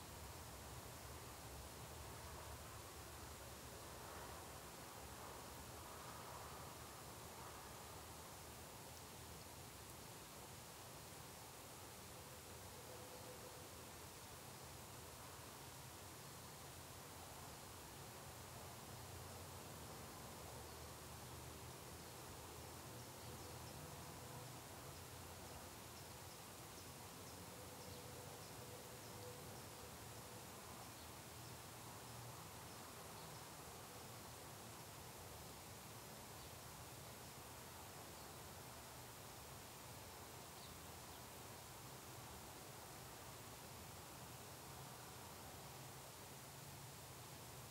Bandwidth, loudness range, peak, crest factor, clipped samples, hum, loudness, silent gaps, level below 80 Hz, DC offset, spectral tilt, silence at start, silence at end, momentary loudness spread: 16 kHz; 1 LU; -40 dBFS; 16 dB; under 0.1%; none; -55 LUFS; none; -70 dBFS; under 0.1%; -3 dB/octave; 0 s; 0 s; 1 LU